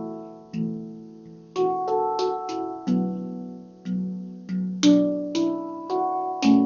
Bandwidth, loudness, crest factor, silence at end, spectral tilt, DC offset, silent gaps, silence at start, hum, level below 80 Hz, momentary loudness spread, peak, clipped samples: 7.2 kHz; -26 LUFS; 18 dB; 0 s; -6 dB/octave; under 0.1%; none; 0 s; none; -66 dBFS; 17 LU; -8 dBFS; under 0.1%